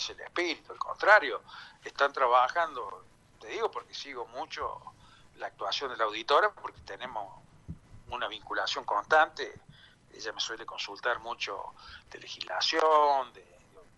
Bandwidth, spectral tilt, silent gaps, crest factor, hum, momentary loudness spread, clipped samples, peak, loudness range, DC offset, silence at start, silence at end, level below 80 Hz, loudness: 11.5 kHz; -2 dB/octave; none; 22 dB; none; 21 LU; under 0.1%; -8 dBFS; 8 LU; under 0.1%; 0 s; 0.15 s; -64 dBFS; -29 LUFS